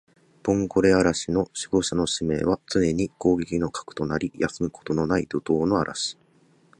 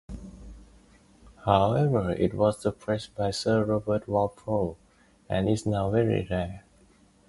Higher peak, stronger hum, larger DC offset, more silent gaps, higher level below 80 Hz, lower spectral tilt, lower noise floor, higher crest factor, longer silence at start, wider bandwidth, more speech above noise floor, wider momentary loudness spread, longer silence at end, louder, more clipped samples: about the same, -6 dBFS vs -6 dBFS; neither; neither; neither; about the same, -48 dBFS vs -48 dBFS; second, -5 dB/octave vs -7 dB/octave; about the same, -60 dBFS vs -59 dBFS; about the same, 18 dB vs 22 dB; first, 0.45 s vs 0.1 s; about the same, 11 kHz vs 11.5 kHz; about the same, 36 dB vs 33 dB; second, 8 LU vs 11 LU; about the same, 0.65 s vs 0.7 s; first, -24 LUFS vs -27 LUFS; neither